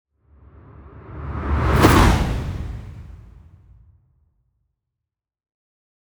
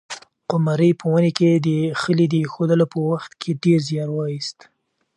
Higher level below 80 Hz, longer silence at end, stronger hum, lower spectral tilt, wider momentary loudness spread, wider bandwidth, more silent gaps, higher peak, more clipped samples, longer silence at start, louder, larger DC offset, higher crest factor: first, -28 dBFS vs -64 dBFS; first, 2.85 s vs 0.65 s; neither; about the same, -6 dB/octave vs -7 dB/octave; first, 25 LU vs 10 LU; first, over 20 kHz vs 10.5 kHz; neither; about the same, -2 dBFS vs -2 dBFS; neither; first, 0.8 s vs 0.1 s; about the same, -19 LUFS vs -20 LUFS; neither; about the same, 20 dB vs 18 dB